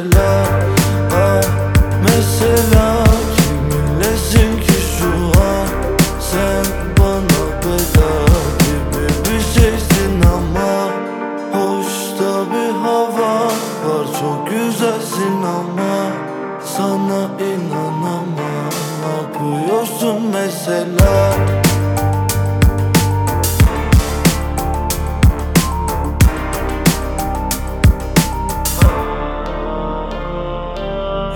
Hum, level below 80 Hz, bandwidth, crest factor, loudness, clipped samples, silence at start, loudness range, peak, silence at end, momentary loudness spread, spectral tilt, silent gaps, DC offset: none; -20 dBFS; over 20 kHz; 14 dB; -16 LUFS; under 0.1%; 0 s; 6 LU; 0 dBFS; 0 s; 8 LU; -5.5 dB/octave; none; under 0.1%